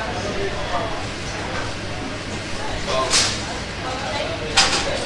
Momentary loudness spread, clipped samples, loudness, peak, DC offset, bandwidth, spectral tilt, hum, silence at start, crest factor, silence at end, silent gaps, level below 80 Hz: 11 LU; under 0.1%; -22 LUFS; 0 dBFS; under 0.1%; 11.5 kHz; -2.5 dB/octave; none; 0 s; 22 dB; 0 s; none; -36 dBFS